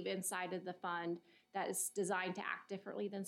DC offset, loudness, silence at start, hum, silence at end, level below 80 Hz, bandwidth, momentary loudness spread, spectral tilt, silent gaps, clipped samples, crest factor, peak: under 0.1%; -42 LUFS; 0 s; none; 0 s; under -90 dBFS; 16 kHz; 7 LU; -3.5 dB/octave; none; under 0.1%; 18 dB; -24 dBFS